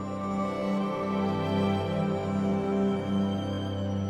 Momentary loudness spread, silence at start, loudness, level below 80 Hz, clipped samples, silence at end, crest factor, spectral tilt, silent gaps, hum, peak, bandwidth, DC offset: 4 LU; 0 s; -29 LUFS; -58 dBFS; under 0.1%; 0 s; 12 dB; -8 dB/octave; none; none; -16 dBFS; 9.8 kHz; under 0.1%